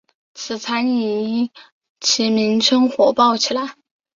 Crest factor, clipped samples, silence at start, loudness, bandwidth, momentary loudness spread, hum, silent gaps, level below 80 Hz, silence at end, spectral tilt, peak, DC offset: 18 dB; under 0.1%; 0.35 s; -18 LUFS; 7.6 kHz; 12 LU; none; 1.72-1.81 s, 1.89-1.96 s; -64 dBFS; 0.45 s; -3 dB/octave; -2 dBFS; under 0.1%